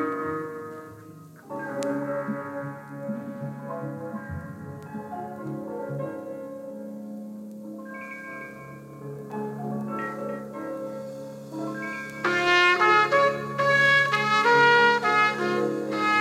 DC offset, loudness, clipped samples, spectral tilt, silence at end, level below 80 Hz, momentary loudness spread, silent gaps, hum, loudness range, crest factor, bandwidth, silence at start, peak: under 0.1%; -24 LUFS; under 0.1%; -4.5 dB/octave; 0 s; -64 dBFS; 20 LU; none; none; 17 LU; 20 dB; 16 kHz; 0 s; -8 dBFS